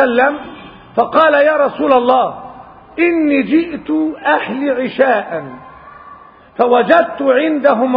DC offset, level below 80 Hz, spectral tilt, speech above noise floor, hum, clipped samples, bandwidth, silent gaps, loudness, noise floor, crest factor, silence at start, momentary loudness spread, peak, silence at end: under 0.1%; -54 dBFS; -8 dB/octave; 26 dB; none; under 0.1%; 5.2 kHz; none; -13 LUFS; -39 dBFS; 14 dB; 0 s; 16 LU; 0 dBFS; 0 s